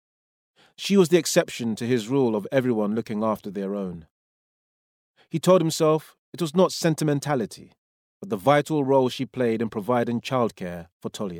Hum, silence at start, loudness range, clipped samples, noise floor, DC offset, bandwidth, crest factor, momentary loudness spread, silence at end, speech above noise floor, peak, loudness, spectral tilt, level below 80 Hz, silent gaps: none; 0.8 s; 3 LU; under 0.1%; under -90 dBFS; under 0.1%; 18 kHz; 20 dB; 14 LU; 0 s; over 67 dB; -4 dBFS; -24 LUFS; -5.5 dB/octave; -66 dBFS; 4.11-5.14 s, 6.19-6.33 s, 7.78-8.21 s, 10.92-11.00 s